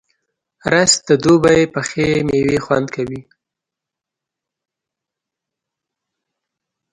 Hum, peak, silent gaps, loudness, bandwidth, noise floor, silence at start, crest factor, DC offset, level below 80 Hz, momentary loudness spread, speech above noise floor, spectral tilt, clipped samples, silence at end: none; 0 dBFS; none; -15 LUFS; 11.5 kHz; -84 dBFS; 0.65 s; 18 dB; under 0.1%; -48 dBFS; 14 LU; 70 dB; -4 dB/octave; under 0.1%; 3.7 s